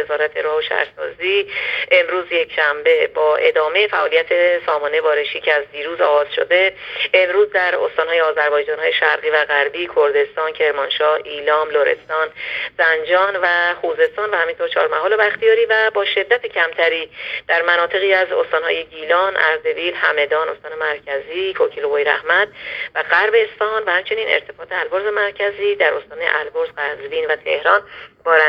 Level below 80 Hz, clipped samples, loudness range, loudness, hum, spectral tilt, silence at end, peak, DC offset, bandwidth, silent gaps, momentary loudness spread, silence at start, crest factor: -62 dBFS; under 0.1%; 3 LU; -17 LUFS; none; -4 dB/octave; 0 s; 0 dBFS; under 0.1%; 5.6 kHz; none; 7 LU; 0 s; 18 dB